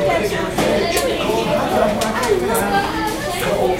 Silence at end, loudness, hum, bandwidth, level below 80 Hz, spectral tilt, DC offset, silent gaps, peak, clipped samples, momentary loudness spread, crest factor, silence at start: 0 s; -18 LUFS; none; 16.5 kHz; -36 dBFS; -4 dB/octave; under 0.1%; none; -2 dBFS; under 0.1%; 4 LU; 16 dB; 0 s